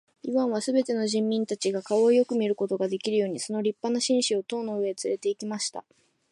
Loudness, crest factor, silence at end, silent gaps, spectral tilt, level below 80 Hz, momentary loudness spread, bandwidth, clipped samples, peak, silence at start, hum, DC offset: -27 LUFS; 14 dB; 0.5 s; none; -4 dB/octave; -80 dBFS; 7 LU; 11.5 kHz; under 0.1%; -12 dBFS; 0.25 s; none; under 0.1%